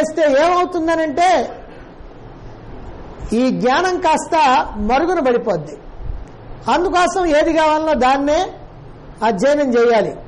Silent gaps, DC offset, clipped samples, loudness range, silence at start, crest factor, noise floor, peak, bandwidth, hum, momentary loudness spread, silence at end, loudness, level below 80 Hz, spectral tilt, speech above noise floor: none; under 0.1%; under 0.1%; 3 LU; 0 s; 10 dB; -36 dBFS; -6 dBFS; 11.5 kHz; none; 20 LU; 0 s; -16 LUFS; -36 dBFS; -4.5 dB/octave; 21 dB